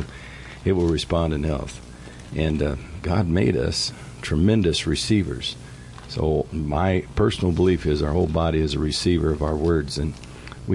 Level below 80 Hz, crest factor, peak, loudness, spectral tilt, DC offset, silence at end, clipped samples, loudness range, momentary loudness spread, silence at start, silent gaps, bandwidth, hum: -36 dBFS; 16 dB; -8 dBFS; -23 LUFS; -6 dB/octave; under 0.1%; 0 s; under 0.1%; 3 LU; 16 LU; 0 s; none; 11.5 kHz; none